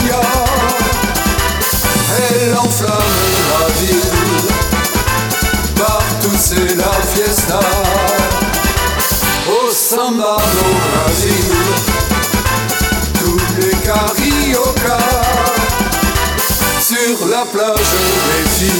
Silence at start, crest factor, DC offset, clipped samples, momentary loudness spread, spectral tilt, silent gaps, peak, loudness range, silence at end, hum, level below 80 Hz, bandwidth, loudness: 0 s; 12 dB; under 0.1%; under 0.1%; 2 LU; -3.5 dB/octave; none; 0 dBFS; 1 LU; 0 s; none; -22 dBFS; 19.5 kHz; -12 LUFS